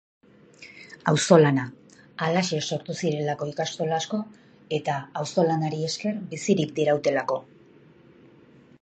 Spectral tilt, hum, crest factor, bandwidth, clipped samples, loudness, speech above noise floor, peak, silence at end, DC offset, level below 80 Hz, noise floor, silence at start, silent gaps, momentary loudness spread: -5 dB/octave; none; 24 dB; 9 kHz; under 0.1%; -25 LUFS; 29 dB; -2 dBFS; 1.4 s; under 0.1%; -68 dBFS; -53 dBFS; 0.6 s; none; 12 LU